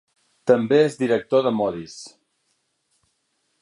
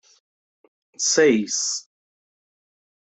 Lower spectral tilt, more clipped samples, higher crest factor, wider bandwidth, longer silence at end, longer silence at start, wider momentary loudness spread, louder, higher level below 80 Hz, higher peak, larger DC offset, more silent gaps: first, -6 dB/octave vs -2 dB/octave; neither; about the same, 20 dB vs 18 dB; first, 11 kHz vs 8.4 kHz; first, 1.55 s vs 1.4 s; second, 0.45 s vs 1 s; first, 21 LU vs 9 LU; about the same, -20 LUFS vs -20 LUFS; first, -64 dBFS vs -74 dBFS; about the same, -4 dBFS vs -6 dBFS; neither; neither